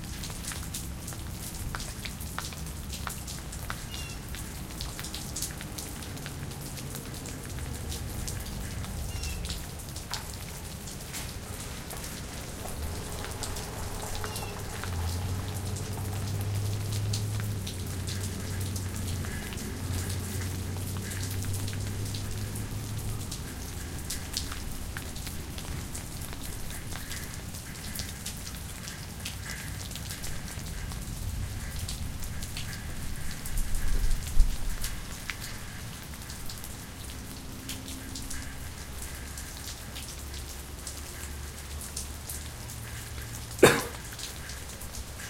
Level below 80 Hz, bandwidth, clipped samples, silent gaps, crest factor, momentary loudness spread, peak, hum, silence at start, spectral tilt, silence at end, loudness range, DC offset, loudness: -38 dBFS; 17 kHz; under 0.1%; none; 30 dB; 6 LU; -4 dBFS; none; 0 s; -4 dB/octave; 0 s; 6 LU; under 0.1%; -35 LUFS